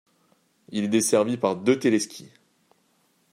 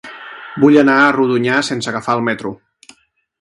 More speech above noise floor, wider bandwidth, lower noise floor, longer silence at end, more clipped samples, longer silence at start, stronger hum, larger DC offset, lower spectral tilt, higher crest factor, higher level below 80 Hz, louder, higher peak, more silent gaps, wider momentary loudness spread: about the same, 43 dB vs 41 dB; first, 16 kHz vs 11.5 kHz; first, -66 dBFS vs -54 dBFS; first, 1.1 s vs 0.85 s; neither; first, 0.7 s vs 0.05 s; neither; neither; about the same, -4.5 dB/octave vs -5.5 dB/octave; about the same, 20 dB vs 16 dB; second, -74 dBFS vs -58 dBFS; second, -23 LUFS vs -14 LUFS; second, -6 dBFS vs 0 dBFS; neither; second, 13 LU vs 19 LU